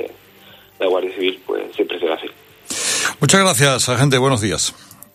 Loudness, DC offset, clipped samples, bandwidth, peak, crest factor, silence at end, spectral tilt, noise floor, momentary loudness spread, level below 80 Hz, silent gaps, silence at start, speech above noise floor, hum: -17 LUFS; under 0.1%; under 0.1%; 15.5 kHz; 0 dBFS; 18 dB; 0.4 s; -3.5 dB/octave; -46 dBFS; 12 LU; -52 dBFS; none; 0 s; 28 dB; none